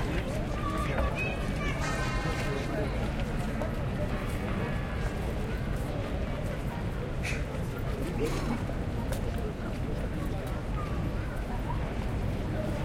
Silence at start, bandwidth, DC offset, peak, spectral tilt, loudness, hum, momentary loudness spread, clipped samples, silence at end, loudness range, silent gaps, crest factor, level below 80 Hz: 0 s; 16 kHz; under 0.1%; -16 dBFS; -6.5 dB/octave; -33 LUFS; none; 4 LU; under 0.1%; 0 s; 2 LU; none; 16 dB; -36 dBFS